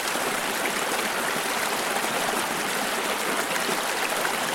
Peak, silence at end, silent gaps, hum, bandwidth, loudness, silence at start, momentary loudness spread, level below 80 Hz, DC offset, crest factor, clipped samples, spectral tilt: -10 dBFS; 0 s; none; none; 16.5 kHz; -25 LUFS; 0 s; 1 LU; -60 dBFS; under 0.1%; 16 dB; under 0.1%; -1 dB/octave